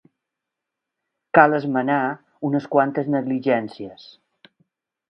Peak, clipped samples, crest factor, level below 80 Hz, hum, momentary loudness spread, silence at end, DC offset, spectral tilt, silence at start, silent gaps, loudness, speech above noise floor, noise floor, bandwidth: 0 dBFS; under 0.1%; 22 dB; -70 dBFS; none; 14 LU; 1.15 s; under 0.1%; -9 dB/octave; 1.35 s; none; -20 LUFS; 64 dB; -84 dBFS; 6.2 kHz